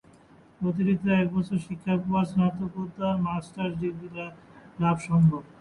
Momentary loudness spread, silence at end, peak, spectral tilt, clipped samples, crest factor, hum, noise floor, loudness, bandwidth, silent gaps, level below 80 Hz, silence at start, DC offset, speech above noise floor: 12 LU; 0.15 s; -12 dBFS; -8.5 dB/octave; under 0.1%; 14 dB; none; -55 dBFS; -27 LUFS; 11 kHz; none; -56 dBFS; 0.6 s; under 0.1%; 29 dB